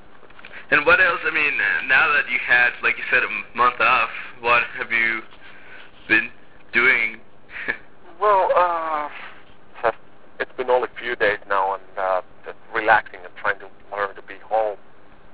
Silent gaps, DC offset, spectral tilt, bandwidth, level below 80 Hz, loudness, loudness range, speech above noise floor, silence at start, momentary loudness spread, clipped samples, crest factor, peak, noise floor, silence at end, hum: none; 1%; -6.5 dB/octave; 4 kHz; -56 dBFS; -20 LUFS; 7 LU; 28 dB; 0.45 s; 16 LU; under 0.1%; 20 dB; -2 dBFS; -48 dBFS; 0.6 s; none